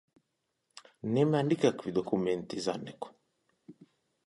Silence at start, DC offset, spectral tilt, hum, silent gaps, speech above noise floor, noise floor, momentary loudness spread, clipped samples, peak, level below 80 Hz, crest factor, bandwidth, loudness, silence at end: 0.75 s; under 0.1%; -6.5 dB/octave; none; none; 51 dB; -82 dBFS; 16 LU; under 0.1%; -12 dBFS; -72 dBFS; 20 dB; 11.5 kHz; -31 LUFS; 0.55 s